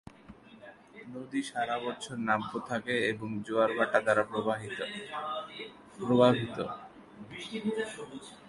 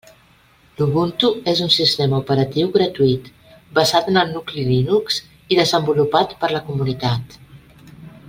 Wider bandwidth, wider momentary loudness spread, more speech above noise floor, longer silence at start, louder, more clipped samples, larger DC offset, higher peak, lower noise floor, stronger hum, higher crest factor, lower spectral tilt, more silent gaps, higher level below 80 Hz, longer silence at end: second, 11.5 kHz vs 16.5 kHz; first, 21 LU vs 8 LU; second, 22 dB vs 35 dB; second, 0.05 s vs 0.8 s; second, -31 LUFS vs -18 LUFS; neither; neither; second, -10 dBFS vs -2 dBFS; about the same, -53 dBFS vs -53 dBFS; neither; about the same, 22 dB vs 18 dB; about the same, -5.5 dB/octave vs -5.5 dB/octave; neither; second, -68 dBFS vs -50 dBFS; about the same, 0 s vs 0.1 s